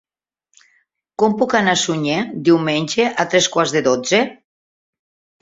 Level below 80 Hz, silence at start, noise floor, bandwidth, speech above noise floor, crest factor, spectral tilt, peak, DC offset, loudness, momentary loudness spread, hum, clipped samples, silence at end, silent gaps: -60 dBFS; 1.2 s; -69 dBFS; 8 kHz; 53 dB; 18 dB; -3.5 dB/octave; -2 dBFS; under 0.1%; -17 LUFS; 4 LU; none; under 0.1%; 1.1 s; none